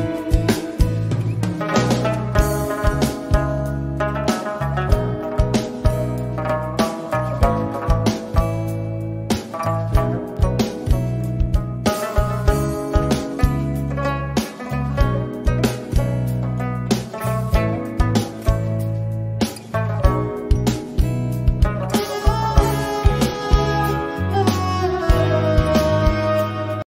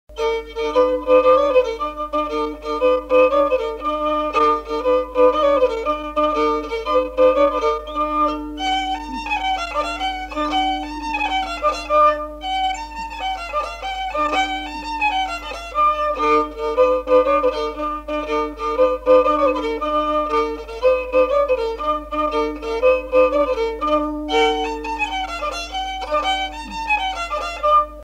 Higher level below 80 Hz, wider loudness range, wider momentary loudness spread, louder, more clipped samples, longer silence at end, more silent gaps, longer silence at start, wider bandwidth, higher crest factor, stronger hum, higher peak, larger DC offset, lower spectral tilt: first, -24 dBFS vs -40 dBFS; about the same, 3 LU vs 4 LU; second, 5 LU vs 9 LU; about the same, -21 LUFS vs -19 LUFS; neither; about the same, 0.05 s vs 0 s; neither; about the same, 0 s vs 0.1 s; first, 16 kHz vs 10.5 kHz; about the same, 18 dB vs 16 dB; neither; about the same, -2 dBFS vs -2 dBFS; neither; first, -6.5 dB/octave vs -4 dB/octave